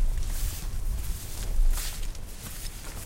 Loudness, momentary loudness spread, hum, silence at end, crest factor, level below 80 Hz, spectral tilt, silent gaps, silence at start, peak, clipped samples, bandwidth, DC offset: -35 LUFS; 8 LU; none; 0 s; 14 dB; -28 dBFS; -3.5 dB/octave; none; 0 s; -14 dBFS; under 0.1%; 16 kHz; under 0.1%